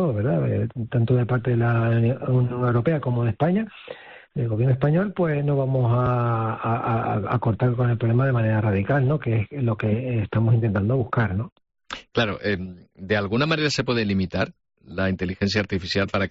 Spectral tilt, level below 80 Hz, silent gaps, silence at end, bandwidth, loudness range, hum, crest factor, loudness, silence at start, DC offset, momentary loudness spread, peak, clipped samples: -6.5 dB/octave; -52 dBFS; 11.52-11.56 s; 0 s; 7.6 kHz; 2 LU; none; 14 dB; -23 LUFS; 0 s; under 0.1%; 7 LU; -10 dBFS; under 0.1%